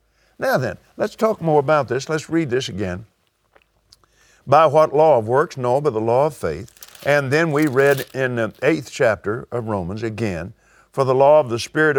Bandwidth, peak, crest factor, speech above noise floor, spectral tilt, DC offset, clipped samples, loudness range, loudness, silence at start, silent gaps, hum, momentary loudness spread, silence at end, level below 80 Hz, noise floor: 19.5 kHz; 0 dBFS; 20 dB; 41 dB; -6 dB/octave; under 0.1%; under 0.1%; 4 LU; -19 LUFS; 0.4 s; none; none; 13 LU; 0 s; -54 dBFS; -59 dBFS